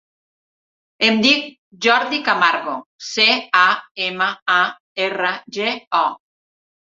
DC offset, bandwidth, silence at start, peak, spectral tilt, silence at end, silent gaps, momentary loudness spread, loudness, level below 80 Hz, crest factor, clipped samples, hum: under 0.1%; 7.8 kHz; 1 s; 0 dBFS; -2.5 dB/octave; 0.7 s; 1.58-1.71 s, 2.86-2.99 s, 3.91-3.95 s, 4.42-4.46 s, 4.80-4.95 s, 5.87-5.91 s; 9 LU; -17 LUFS; -68 dBFS; 20 dB; under 0.1%; none